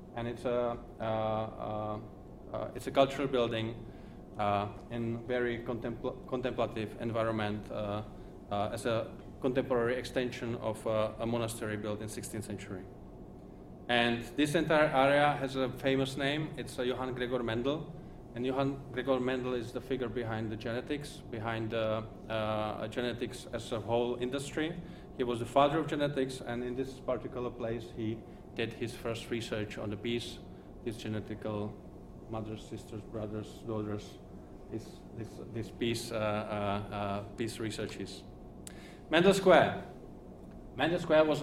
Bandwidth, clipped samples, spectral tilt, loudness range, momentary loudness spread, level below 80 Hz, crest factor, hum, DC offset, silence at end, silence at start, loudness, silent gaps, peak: 16 kHz; under 0.1%; -5.5 dB/octave; 9 LU; 18 LU; -54 dBFS; 24 dB; none; under 0.1%; 0 s; 0 s; -34 LUFS; none; -10 dBFS